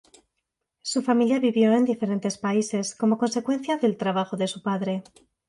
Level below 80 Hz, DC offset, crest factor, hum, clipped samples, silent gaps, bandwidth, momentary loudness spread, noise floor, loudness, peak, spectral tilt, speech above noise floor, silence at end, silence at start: -72 dBFS; under 0.1%; 16 dB; none; under 0.1%; none; 11.5 kHz; 8 LU; -81 dBFS; -24 LUFS; -8 dBFS; -5.5 dB/octave; 57 dB; 0.5 s; 0.85 s